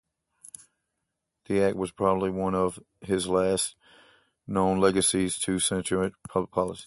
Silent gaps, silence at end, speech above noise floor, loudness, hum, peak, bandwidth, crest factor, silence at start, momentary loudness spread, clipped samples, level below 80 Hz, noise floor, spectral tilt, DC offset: none; 0 s; 56 dB; -26 LUFS; none; -8 dBFS; 12 kHz; 20 dB; 1.5 s; 9 LU; under 0.1%; -54 dBFS; -82 dBFS; -4 dB/octave; under 0.1%